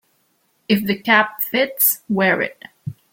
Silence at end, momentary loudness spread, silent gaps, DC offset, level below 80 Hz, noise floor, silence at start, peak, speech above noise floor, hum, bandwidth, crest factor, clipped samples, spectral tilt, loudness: 0.2 s; 16 LU; none; under 0.1%; -62 dBFS; -64 dBFS; 0.7 s; -2 dBFS; 46 dB; none; 17 kHz; 18 dB; under 0.1%; -3.5 dB/octave; -17 LUFS